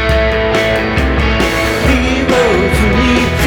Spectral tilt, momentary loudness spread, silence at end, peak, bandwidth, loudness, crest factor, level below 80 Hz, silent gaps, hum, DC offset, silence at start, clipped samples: -5.5 dB/octave; 2 LU; 0 s; 0 dBFS; 19.5 kHz; -12 LUFS; 12 dB; -18 dBFS; none; none; under 0.1%; 0 s; under 0.1%